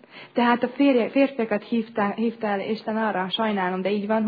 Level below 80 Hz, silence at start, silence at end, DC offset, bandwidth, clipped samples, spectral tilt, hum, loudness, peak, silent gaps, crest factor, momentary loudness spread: -72 dBFS; 0.15 s; 0 s; under 0.1%; 5 kHz; under 0.1%; -8.5 dB/octave; none; -24 LUFS; -8 dBFS; none; 16 dB; 7 LU